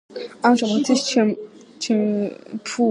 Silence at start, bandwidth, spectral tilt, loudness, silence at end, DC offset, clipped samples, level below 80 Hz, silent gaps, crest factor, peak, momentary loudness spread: 0.1 s; 11 kHz; -4.5 dB/octave; -20 LUFS; 0 s; under 0.1%; under 0.1%; -72 dBFS; none; 18 dB; -2 dBFS; 14 LU